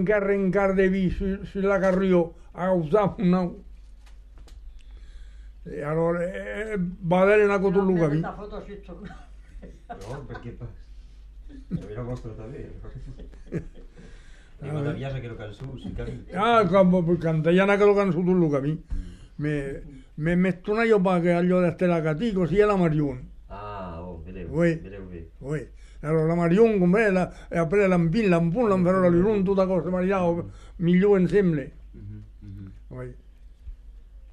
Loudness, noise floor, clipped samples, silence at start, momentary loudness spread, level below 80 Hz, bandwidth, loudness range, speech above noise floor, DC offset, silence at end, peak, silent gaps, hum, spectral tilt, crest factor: -23 LUFS; -46 dBFS; under 0.1%; 0 s; 21 LU; -42 dBFS; 9.4 kHz; 16 LU; 23 dB; under 0.1%; 0 s; -6 dBFS; none; none; -8.5 dB/octave; 18 dB